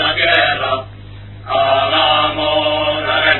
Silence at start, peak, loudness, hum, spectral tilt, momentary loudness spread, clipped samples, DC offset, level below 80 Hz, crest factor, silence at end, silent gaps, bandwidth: 0 s; 0 dBFS; -14 LUFS; 50 Hz at -45 dBFS; -6.5 dB/octave; 13 LU; under 0.1%; 0.4%; -42 dBFS; 16 dB; 0 s; none; 4.3 kHz